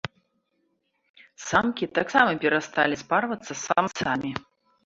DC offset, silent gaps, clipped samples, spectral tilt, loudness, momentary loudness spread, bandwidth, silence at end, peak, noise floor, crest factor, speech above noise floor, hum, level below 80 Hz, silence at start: under 0.1%; 1.10-1.14 s; under 0.1%; -4 dB/octave; -24 LUFS; 12 LU; 8 kHz; 0.45 s; -4 dBFS; -73 dBFS; 22 dB; 48 dB; none; -60 dBFS; 0.05 s